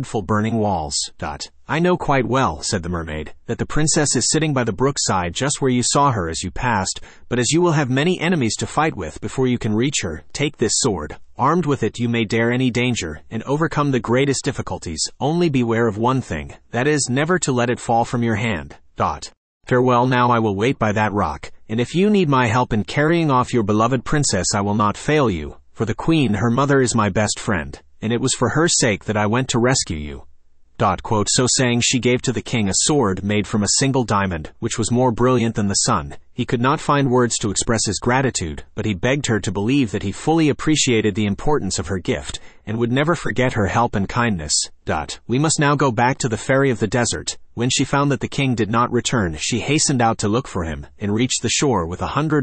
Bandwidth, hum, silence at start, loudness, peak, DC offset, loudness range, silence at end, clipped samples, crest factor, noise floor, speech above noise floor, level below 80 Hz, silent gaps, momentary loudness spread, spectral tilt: 8.8 kHz; none; 0 s; -19 LUFS; -4 dBFS; under 0.1%; 2 LU; 0 s; under 0.1%; 16 dB; -46 dBFS; 27 dB; -42 dBFS; 19.37-19.61 s; 9 LU; -4.5 dB/octave